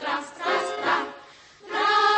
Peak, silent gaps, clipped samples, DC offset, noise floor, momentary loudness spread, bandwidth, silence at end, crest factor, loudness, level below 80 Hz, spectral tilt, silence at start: -10 dBFS; none; under 0.1%; under 0.1%; -48 dBFS; 13 LU; 8.8 kHz; 0 s; 16 dB; -25 LUFS; -70 dBFS; -1.5 dB/octave; 0 s